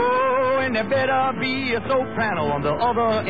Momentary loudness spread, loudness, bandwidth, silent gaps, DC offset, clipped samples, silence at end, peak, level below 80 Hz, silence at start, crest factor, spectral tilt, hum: 4 LU; -21 LUFS; 4.9 kHz; none; 0.9%; under 0.1%; 0 s; -10 dBFS; -48 dBFS; 0 s; 12 dB; -8 dB/octave; none